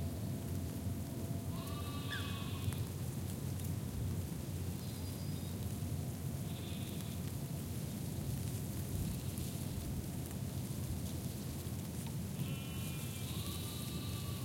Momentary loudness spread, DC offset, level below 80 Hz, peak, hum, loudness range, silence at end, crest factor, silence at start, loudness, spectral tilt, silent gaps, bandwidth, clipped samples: 2 LU; under 0.1%; -54 dBFS; -24 dBFS; none; 1 LU; 0 s; 16 dB; 0 s; -42 LUFS; -5.5 dB/octave; none; 16.5 kHz; under 0.1%